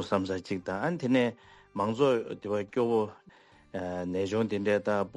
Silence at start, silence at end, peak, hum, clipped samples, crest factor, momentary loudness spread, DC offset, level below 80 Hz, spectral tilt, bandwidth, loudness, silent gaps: 0 s; 0.05 s; -12 dBFS; none; under 0.1%; 18 dB; 9 LU; under 0.1%; -68 dBFS; -6.5 dB/octave; 11.5 kHz; -30 LUFS; none